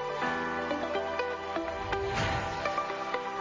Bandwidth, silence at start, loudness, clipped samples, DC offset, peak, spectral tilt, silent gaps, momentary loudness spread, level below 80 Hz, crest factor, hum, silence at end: 7.6 kHz; 0 s; -32 LUFS; under 0.1%; under 0.1%; -18 dBFS; -5 dB/octave; none; 3 LU; -50 dBFS; 16 dB; none; 0 s